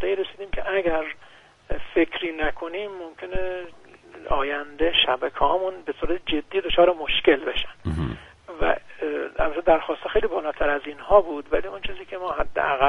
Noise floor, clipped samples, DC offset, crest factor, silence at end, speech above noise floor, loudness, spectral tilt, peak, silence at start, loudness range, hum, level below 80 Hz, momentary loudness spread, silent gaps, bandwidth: -51 dBFS; under 0.1%; under 0.1%; 22 dB; 0 s; 28 dB; -24 LUFS; -6.5 dB/octave; -2 dBFS; 0 s; 6 LU; none; -38 dBFS; 14 LU; none; 5.4 kHz